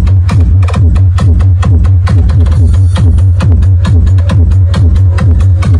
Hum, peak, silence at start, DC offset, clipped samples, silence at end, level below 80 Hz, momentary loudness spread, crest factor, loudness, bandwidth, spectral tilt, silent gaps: none; 0 dBFS; 0 s; under 0.1%; under 0.1%; 0 s; -12 dBFS; 1 LU; 6 dB; -7 LUFS; 9.4 kHz; -8 dB/octave; none